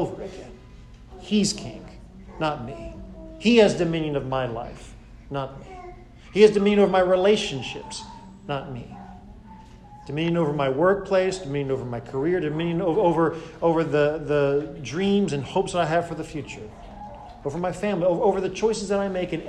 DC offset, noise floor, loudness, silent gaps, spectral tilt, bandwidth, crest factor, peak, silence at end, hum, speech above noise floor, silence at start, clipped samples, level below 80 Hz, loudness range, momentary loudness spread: under 0.1%; -45 dBFS; -23 LUFS; none; -5.5 dB/octave; 11 kHz; 20 dB; -4 dBFS; 0 s; none; 22 dB; 0 s; under 0.1%; -48 dBFS; 5 LU; 22 LU